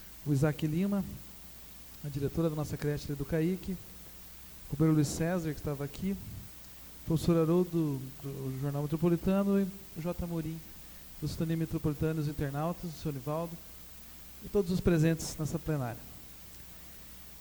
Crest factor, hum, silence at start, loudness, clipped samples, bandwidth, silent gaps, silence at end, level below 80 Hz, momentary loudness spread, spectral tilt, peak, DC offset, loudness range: 20 dB; none; 0 s; -33 LUFS; under 0.1%; over 20 kHz; none; 0 s; -50 dBFS; 18 LU; -7 dB/octave; -14 dBFS; under 0.1%; 4 LU